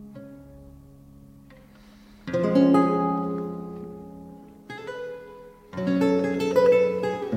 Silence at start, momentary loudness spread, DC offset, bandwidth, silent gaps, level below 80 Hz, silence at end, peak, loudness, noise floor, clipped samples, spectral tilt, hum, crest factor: 0 s; 24 LU; under 0.1%; 13 kHz; none; -58 dBFS; 0 s; -6 dBFS; -23 LUFS; -50 dBFS; under 0.1%; -7.5 dB/octave; none; 18 dB